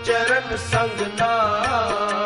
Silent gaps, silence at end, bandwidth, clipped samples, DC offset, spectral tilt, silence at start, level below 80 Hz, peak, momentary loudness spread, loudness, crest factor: none; 0 s; 11.5 kHz; under 0.1%; under 0.1%; -4 dB/octave; 0 s; -46 dBFS; -6 dBFS; 4 LU; -21 LUFS; 14 dB